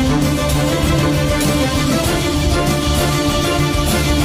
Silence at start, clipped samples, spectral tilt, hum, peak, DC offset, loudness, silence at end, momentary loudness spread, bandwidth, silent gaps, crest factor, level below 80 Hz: 0 s; under 0.1%; -5 dB/octave; none; -4 dBFS; under 0.1%; -16 LUFS; 0 s; 1 LU; 16 kHz; none; 12 dB; -24 dBFS